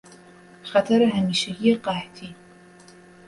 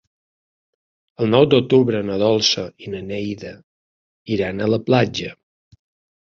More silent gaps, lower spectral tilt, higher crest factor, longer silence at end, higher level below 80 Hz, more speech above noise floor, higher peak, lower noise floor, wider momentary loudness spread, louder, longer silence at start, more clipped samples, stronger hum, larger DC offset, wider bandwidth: second, none vs 3.63-4.25 s; about the same, -5.5 dB/octave vs -5.5 dB/octave; about the same, 18 dB vs 20 dB; about the same, 0.95 s vs 0.9 s; second, -60 dBFS vs -52 dBFS; second, 27 dB vs over 72 dB; second, -6 dBFS vs -2 dBFS; second, -49 dBFS vs under -90 dBFS; first, 22 LU vs 15 LU; second, -22 LUFS vs -19 LUFS; second, 0.65 s vs 1.2 s; neither; neither; neither; first, 11.5 kHz vs 7.4 kHz